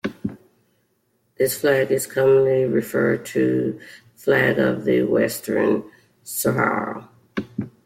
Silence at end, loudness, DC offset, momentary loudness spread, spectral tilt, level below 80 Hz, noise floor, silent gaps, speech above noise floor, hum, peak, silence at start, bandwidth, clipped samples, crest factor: 0.15 s; -21 LUFS; under 0.1%; 14 LU; -5.5 dB/octave; -60 dBFS; -67 dBFS; none; 48 dB; none; -6 dBFS; 0.05 s; 16.5 kHz; under 0.1%; 16 dB